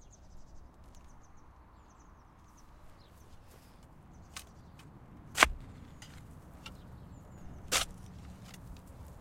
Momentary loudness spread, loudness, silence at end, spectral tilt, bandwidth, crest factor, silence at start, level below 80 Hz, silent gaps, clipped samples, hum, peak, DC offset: 27 LU; -32 LUFS; 0 s; -1.5 dB/octave; 16 kHz; 40 dB; 0 s; -52 dBFS; none; under 0.1%; none; -2 dBFS; under 0.1%